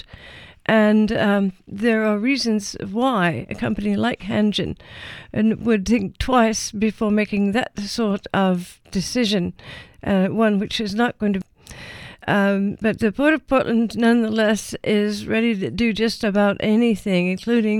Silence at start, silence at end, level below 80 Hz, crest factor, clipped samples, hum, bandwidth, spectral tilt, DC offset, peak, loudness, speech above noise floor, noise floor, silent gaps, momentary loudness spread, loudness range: 0.2 s; 0 s; -44 dBFS; 18 dB; under 0.1%; none; 13 kHz; -5.5 dB/octave; under 0.1%; -2 dBFS; -20 LUFS; 23 dB; -43 dBFS; none; 11 LU; 3 LU